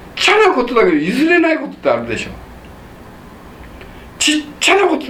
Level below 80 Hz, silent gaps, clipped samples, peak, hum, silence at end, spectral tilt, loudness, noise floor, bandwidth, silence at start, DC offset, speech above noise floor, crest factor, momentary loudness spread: -42 dBFS; none; under 0.1%; 0 dBFS; none; 0 s; -3 dB/octave; -13 LUFS; -36 dBFS; 15.5 kHz; 0 s; under 0.1%; 22 dB; 16 dB; 12 LU